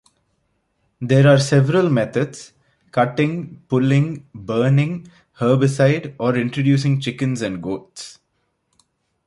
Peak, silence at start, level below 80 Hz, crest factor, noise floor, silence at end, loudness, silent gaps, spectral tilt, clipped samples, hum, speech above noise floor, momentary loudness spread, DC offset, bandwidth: -2 dBFS; 1 s; -58 dBFS; 18 dB; -70 dBFS; 1.15 s; -18 LUFS; none; -7 dB/octave; under 0.1%; none; 52 dB; 15 LU; under 0.1%; 11.5 kHz